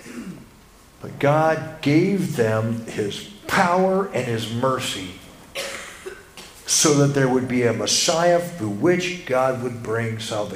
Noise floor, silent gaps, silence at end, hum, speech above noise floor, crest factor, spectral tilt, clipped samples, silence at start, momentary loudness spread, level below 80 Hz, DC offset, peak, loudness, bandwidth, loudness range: -49 dBFS; none; 0 s; none; 28 dB; 20 dB; -4 dB/octave; under 0.1%; 0 s; 18 LU; -54 dBFS; under 0.1%; -2 dBFS; -21 LUFS; 16 kHz; 4 LU